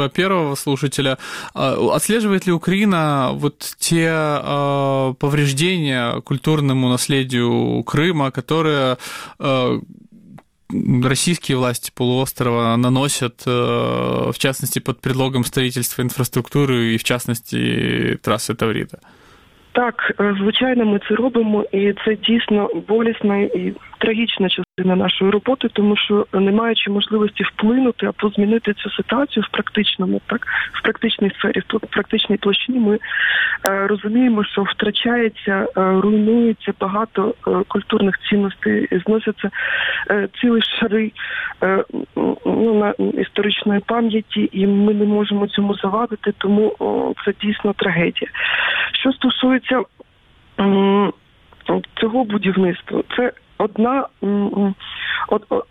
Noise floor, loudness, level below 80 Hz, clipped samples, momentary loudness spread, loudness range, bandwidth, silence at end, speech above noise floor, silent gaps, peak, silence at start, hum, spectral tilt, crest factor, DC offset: -52 dBFS; -18 LUFS; -52 dBFS; under 0.1%; 5 LU; 2 LU; 16 kHz; 0.05 s; 34 dB; none; 0 dBFS; 0 s; none; -5 dB/octave; 18 dB; under 0.1%